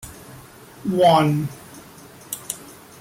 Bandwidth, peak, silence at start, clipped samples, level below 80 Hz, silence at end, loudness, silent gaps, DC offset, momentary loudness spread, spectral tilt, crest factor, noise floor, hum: 17 kHz; -4 dBFS; 0.05 s; under 0.1%; -56 dBFS; 0.3 s; -21 LUFS; none; under 0.1%; 27 LU; -5.5 dB/octave; 18 dB; -44 dBFS; none